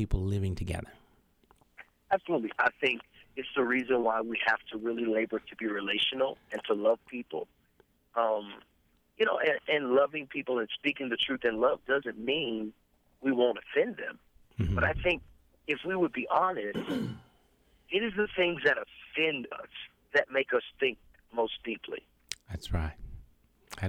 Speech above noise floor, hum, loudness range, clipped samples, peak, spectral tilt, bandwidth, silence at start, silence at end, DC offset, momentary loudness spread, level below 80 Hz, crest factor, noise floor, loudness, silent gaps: 38 dB; none; 3 LU; under 0.1%; -14 dBFS; -5.5 dB/octave; 16 kHz; 0 s; 0 s; under 0.1%; 14 LU; -48 dBFS; 18 dB; -69 dBFS; -31 LUFS; none